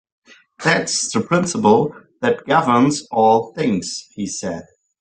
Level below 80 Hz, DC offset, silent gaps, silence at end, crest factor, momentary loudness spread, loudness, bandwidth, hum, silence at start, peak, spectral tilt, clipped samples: -58 dBFS; under 0.1%; none; 0.4 s; 16 dB; 12 LU; -18 LUFS; 10 kHz; none; 0.6 s; -2 dBFS; -4.5 dB/octave; under 0.1%